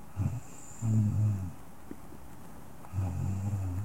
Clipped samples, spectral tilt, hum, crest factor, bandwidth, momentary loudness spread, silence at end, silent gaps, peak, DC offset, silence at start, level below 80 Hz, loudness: under 0.1%; -8 dB/octave; none; 14 dB; 16 kHz; 21 LU; 0 s; none; -18 dBFS; 0.6%; 0 s; -56 dBFS; -33 LUFS